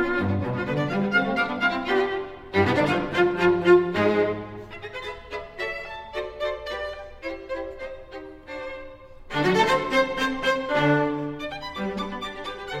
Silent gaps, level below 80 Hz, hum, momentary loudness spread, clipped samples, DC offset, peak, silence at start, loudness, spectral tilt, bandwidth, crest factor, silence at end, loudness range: none; -50 dBFS; none; 16 LU; under 0.1%; under 0.1%; -6 dBFS; 0 s; -24 LUFS; -6 dB/octave; 13 kHz; 20 dB; 0 s; 11 LU